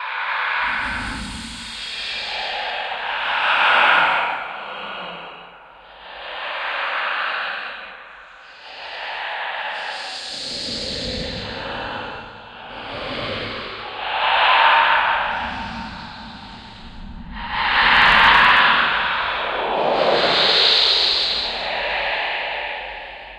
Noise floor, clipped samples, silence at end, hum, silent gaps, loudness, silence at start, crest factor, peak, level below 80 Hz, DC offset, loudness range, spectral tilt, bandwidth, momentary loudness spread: -43 dBFS; under 0.1%; 0 s; none; none; -18 LUFS; 0 s; 20 dB; 0 dBFS; -44 dBFS; under 0.1%; 12 LU; -2.5 dB/octave; 12.5 kHz; 22 LU